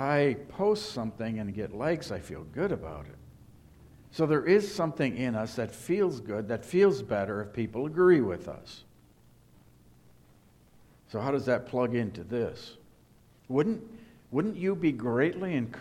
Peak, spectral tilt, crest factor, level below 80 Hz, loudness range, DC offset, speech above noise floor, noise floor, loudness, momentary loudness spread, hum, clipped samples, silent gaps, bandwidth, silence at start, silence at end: -12 dBFS; -7 dB/octave; 18 dB; -60 dBFS; 7 LU; under 0.1%; 31 dB; -60 dBFS; -30 LUFS; 15 LU; none; under 0.1%; none; 13.5 kHz; 0 s; 0 s